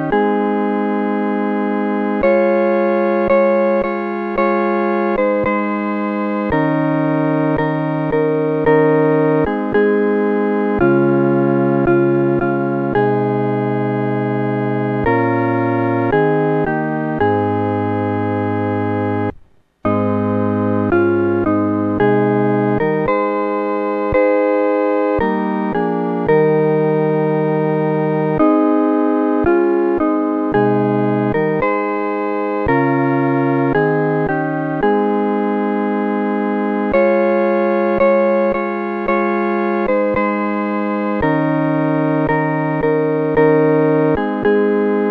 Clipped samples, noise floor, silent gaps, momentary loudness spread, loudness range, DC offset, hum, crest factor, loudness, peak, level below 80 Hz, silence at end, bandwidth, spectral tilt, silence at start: under 0.1%; -45 dBFS; none; 5 LU; 2 LU; under 0.1%; none; 14 dB; -16 LUFS; -2 dBFS; -44 dBFS; 0 s; 5 kHz; -10.5 dB/octave; 0 s